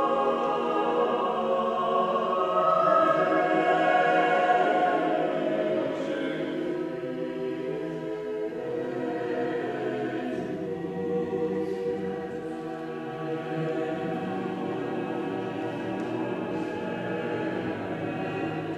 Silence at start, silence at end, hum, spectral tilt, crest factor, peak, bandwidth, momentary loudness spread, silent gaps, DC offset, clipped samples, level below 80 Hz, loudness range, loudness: 0 s; 0 s; none; -7 dB/octave; 18 dB; -10 dBFS; 11.5 kHz; 10 LU; none; under 0.1%; under 0.1%; -66 dBFS; 8 LU; -28 LUFS